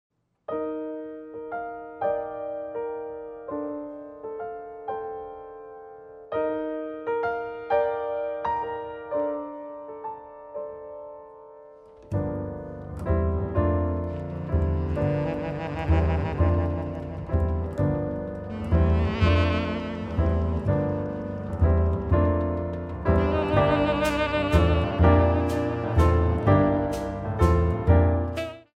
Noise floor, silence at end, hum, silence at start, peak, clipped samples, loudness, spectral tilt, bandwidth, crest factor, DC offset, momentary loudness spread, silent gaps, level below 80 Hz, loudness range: -48 dBFS; 0.15 s; none; 0.5 s; -6 dBFS; under 0.1%; -26 LUFS; -8.5 dB/octave; 8.6 kHz; 20 dB; under 0.1%; 16 LU; none; -34 dBFS; 12 LU